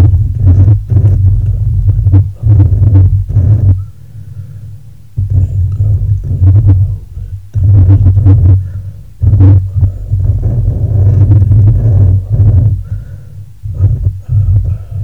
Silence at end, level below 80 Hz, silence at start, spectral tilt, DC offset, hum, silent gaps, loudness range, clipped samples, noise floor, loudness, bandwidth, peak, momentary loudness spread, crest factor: 0 s; -18 dBFS; 0 s; -11.5 dB/octave; 2%; none; none; 4 LU; under 0.1%; -31 dBFS; -9 LUFS; 1.6 kHz; 0 dBFS; 17 LU; 8 dB